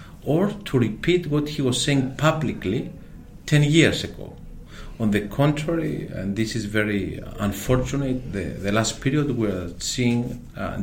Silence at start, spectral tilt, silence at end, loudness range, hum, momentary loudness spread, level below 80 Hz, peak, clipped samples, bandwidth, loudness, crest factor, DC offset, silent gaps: 0 s; -5.5 dB/octave; 0 s; 3 LU; none; 11 LU; -40 dBFS; -2 dBFS; under 0.1%; 16.5 kHz; -23 LUFS; 20 dB; under 0.1%; none